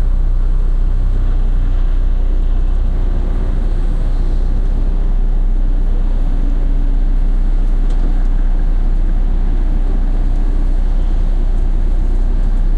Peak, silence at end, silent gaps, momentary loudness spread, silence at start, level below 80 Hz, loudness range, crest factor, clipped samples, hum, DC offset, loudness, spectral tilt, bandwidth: -6 dBFS; 0 s; none; 1 LU; 0 s; -12 dBFS; 1 LU; 6 dB; under 0.1%; none; under 0.1%; -20 LUFS; -8.5 dB/octave; 2.2 kHz